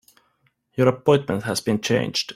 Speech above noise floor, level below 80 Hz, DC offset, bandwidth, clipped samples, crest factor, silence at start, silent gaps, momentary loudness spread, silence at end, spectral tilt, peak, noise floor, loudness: 46 dB; -58 dBFS; under 0.1%; 15.5 kHz; under 0.1%; 20 dB; 0.75 s; none; 5 LU; 0.05 s; -5 dB/octave; -4 dBFS; -67 dBFS; -21 LUFS